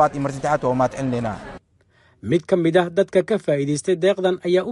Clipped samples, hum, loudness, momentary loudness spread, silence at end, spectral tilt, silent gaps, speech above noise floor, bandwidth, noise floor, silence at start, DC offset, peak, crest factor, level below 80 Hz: under 0.1%; none; -21 LUFS; 8 LU; 0 s; -6 dB/octave; none; 39 dB; 11.5 kHz; -58 dBFS; 0 s; under 0.1%; -4 dBFS; 16 dB; -52 dBFS